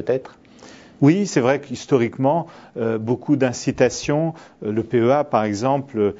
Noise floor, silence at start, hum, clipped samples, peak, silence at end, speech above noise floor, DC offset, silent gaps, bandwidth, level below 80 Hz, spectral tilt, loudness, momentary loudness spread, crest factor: -44 dBFS; 0 s; none; under 0.1%; -2 dBFS; 0 s; 25 dB; under 0.1%; none; 8 kHz; -56 dBFS; -6.5 dB/octave; -20 LUFS; 8 LU; 18 dB